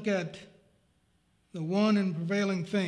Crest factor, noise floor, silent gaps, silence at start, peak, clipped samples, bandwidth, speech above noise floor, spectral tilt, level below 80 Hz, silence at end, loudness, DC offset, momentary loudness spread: 14 dB; -70 dBFS; none; 0 s; -16 dBFS; under 0.1%; 10 kHz; 41 dB; -6.5 dB/octave; -74 dBFS; 0 s; -29 LUFS; under 0.1%; 17 LU